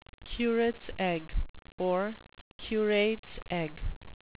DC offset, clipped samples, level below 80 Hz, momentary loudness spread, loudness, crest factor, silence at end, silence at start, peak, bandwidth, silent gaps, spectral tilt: 0.3%; under 0.1%; -42 dBFS; 16 LU; -32 LUFS; 16 dB; 0.25 s; 0.25 s; -16 dBFS; 4 kHz; 1.49-1.54 s, 1.72-1.78 s, 2.41-2.59 s, 3.19-3.23 s, 3.96-4.01 s; -4 dB/octave